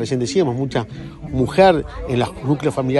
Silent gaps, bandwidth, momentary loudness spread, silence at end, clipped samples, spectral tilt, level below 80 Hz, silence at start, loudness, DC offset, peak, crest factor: none; 11.5 kHz; 12 LU; 0 s; under 0.1%; -6.5 dB/octave; -38 dBFS; 0 s; -19 LUFS; under 0.1%; 0 dBFS; 18 dB